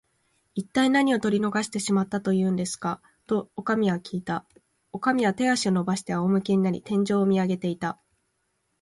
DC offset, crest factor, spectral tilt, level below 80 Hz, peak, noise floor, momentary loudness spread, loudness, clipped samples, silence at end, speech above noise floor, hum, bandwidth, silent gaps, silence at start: under 0.1%; 16 dB; -5.5 dB/octave; -64 dBFS; -10 dBFS; -74 dBFS; 10 LU; -25 LUFS; under 0.1%; 0.9 s; 50 dB; none; 11.5 kHz; none; 0.55 s